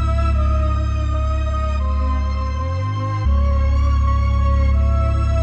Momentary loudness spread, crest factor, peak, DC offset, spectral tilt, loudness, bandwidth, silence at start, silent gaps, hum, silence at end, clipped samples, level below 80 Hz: 5 LU; 8 dB; -8 dBFS; under 0.1%; -8 dB/octave; -19 LUFS; 6.8 kHz; 0 s; none; none; 0 s; under 0.1%; -18 dBFS